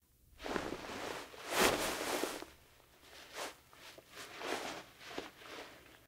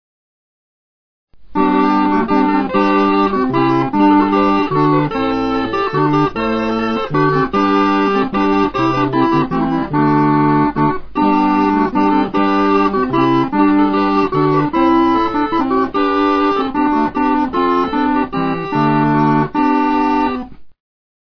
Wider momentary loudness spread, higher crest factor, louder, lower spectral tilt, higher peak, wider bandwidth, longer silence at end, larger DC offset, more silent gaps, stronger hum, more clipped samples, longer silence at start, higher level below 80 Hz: first, 22 LU vs 4 LU; first, 30 dB vs 12 dB; second, -40 LUFS vs -14 LUFS; second, -2 dB/octave vs -8 dB/octave; second, -12 dBFS vs -2 dBFS; first, 16 kHz vs 5.4 kHz; second, 0 s vs 0.6 s; second, under 0.1% vs 1%; neither; neither; neither; second, 0.35 s vs 1.5 s; second, -64 dBFS vs -40 dBFS